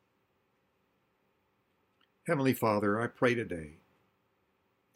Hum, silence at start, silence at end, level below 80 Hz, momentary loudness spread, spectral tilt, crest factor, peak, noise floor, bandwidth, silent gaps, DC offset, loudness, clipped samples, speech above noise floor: none; 2.25 s; 1.25 s; -68 dBFS; 14 LU; -6.5 dB/octave; 22 dB; -12 dBFS; -75 dBFS; 16.5 kHz; none; under 0.1%; -31 LUFS; under 0.1%; 45 dB